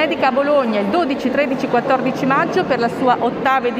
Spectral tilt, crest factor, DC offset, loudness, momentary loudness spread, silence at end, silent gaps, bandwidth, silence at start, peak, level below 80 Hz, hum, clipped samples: -6 dB/octave; 14 dB; under 0.1%; -17 LUFS; 2 LU; 0 s; none; 15 kHz; 0 s; -4 dBFS; -54 dBFS; none; under 0.1%